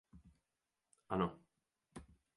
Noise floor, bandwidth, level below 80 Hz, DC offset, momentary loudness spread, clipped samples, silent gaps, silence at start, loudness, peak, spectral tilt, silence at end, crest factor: -90 dBFS; 11 kHz; -68 dBFS; under 0.1%; 20 LU; under 0.1%; none; 0.15 s; -41 LUFS; -22 dBFS; -7.5 dB/octave; 0.3 s; 24 dB